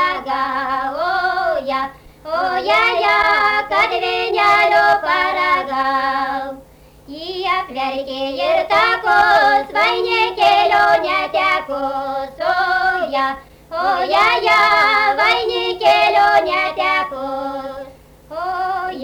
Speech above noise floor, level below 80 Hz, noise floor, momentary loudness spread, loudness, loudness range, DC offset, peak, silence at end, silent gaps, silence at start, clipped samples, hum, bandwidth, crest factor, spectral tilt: 28 dB; -48 dBFS; -43 dBFS; 12 LU; -16 LUFS; 4 LU; under 0.1%; -4 dBFS; 0 s; none; 0 s; under 0.1%; none; over 20 kHz; 12 dB; -3 dB/octave